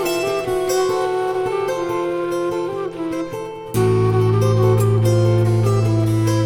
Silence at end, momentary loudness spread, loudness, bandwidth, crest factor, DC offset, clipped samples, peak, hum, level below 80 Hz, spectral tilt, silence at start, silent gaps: 0 s; 9 LU; -19 LUFS; 16 kHz; 12 dB; under 0.1%; under 0.1%; -4 dBFS; none; -44 dBFS; -7 dB/octave; 0 s; none